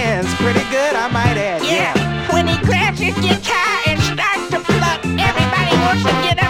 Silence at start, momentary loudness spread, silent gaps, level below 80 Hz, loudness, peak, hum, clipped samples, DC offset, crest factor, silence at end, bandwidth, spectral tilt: 0 s; 3 LU; none; -36 dBFS; -16 LUFS; 0 dBFS; none; under 0.1%; under 0.1%; 14 dB; 0 s; 17 kHz; -5 dB/octave